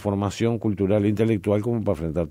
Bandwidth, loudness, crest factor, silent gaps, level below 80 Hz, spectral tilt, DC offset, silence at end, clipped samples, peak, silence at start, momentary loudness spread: 13.5 kHz; -23 LUFS; 14 dB; none; -46 dBFS; -8 dB/octave; under 0.1%; 0 s; under 0.1%; -8 dBFS; 0 s; 4 LU